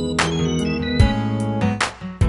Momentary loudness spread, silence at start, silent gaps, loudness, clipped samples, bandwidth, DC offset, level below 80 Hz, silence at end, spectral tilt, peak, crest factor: 4 LU; 0 s; none; -20 LUFS; under 0.1%; 11.5 kHz; under 0.1%; -28 dBFS; 0 s; -5.5 dB/octave; -2 dBFS; 18 dB